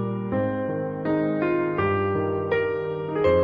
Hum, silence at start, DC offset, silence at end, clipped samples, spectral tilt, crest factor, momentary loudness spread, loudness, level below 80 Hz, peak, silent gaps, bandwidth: none; 0 s; under 0.1%; 0 s; under 0.1%; -10 dB/octave; 14 dB; 5 LU; -25 LUFS; -52 dBFS; -10 dBFS; none; 5.2 kHz